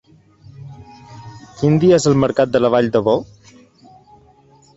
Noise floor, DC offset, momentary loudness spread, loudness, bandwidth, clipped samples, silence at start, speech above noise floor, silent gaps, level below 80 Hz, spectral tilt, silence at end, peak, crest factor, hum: -50 dBFS; under 0.1%; 25 LU; -15 LUFS; 8.2 kHz; under 0.1%; 0.6 s; 36 dB; none; -50 dBFS; -6.5 dB/octave; 1.55 s; -2 dBFS; 16 dB; none